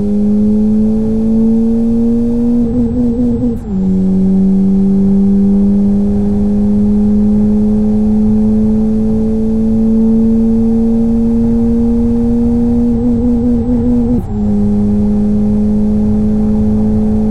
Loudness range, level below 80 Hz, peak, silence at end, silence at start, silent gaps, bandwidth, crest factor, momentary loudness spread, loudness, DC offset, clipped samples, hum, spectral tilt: 2 LU; -22 dBFS; -4 dBFS; 0 s; 0 s; none; 2.6 kHz; 8 dB; 3 LU; -12 LUFS; 8%; under 0.1%; none; -11 dB/octave